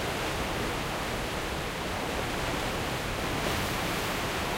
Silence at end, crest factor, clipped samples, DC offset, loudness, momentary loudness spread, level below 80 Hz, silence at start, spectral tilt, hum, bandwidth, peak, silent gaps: 0 s; 14 dB; under 0.1%; under 0.1%; -31 LUFS; 3 LU; -42 dBFS; 0 s; -4 dB/octave; none; 16 kHz; -16 dBFS; none